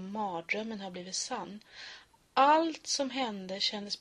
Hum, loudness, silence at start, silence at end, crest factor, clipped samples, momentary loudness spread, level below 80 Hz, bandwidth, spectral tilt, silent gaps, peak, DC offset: none; -31 LUFS; 0 s; 0 s; 20 dB; under 0.1%; 21 LU; -74 dBFS; 11.5 kHz; -2.5 dB/octave; none; -12 dBFS; under 0.1%